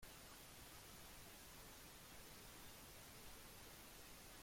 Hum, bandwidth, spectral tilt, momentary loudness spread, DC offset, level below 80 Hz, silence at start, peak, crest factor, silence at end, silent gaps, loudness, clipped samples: none; 16.5 kHz; -2.5 dB/octave; 1 LU; under 0.1%; -70 dBFS; 0 s; -46 dBFS; 14 dB; 0 s; none; -59 LUFS; under 0.1%